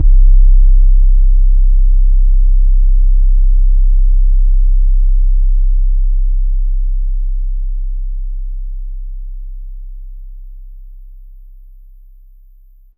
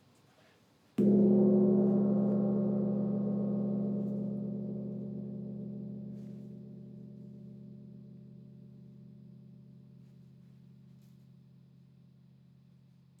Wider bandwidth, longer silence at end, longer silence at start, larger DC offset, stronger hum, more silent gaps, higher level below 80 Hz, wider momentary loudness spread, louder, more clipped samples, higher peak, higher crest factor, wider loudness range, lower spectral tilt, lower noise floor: second, 0.1 kHz vs 2.7 kHz; second, 1.95 s vs 3.25 s; second, 0 s vs 1 s; neither; neither; neither; first, -10 dBFS vs -74 dBFS; second, 19 LU vs 28 LU; first, -16 LUFS vs -31 LUFS; neither; first, 0 dBFS vs -16 dBFS; second, 10 dB vs 18 dB; second, 19 LU vs 25 LU; first, -14 dB/octave vs -12 dB/octave; second, -42 dBFS vs -65 dBFS